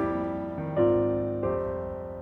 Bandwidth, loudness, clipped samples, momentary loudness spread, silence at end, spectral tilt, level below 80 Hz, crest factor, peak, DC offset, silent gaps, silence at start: 3.8 kHz; -28 LUFS; under 0.1%; 9 LU; 0 s; -10.5 dB/octave; -50 dBFS; 16 dB; -12 dBFS; under 0.1%; none; 0 s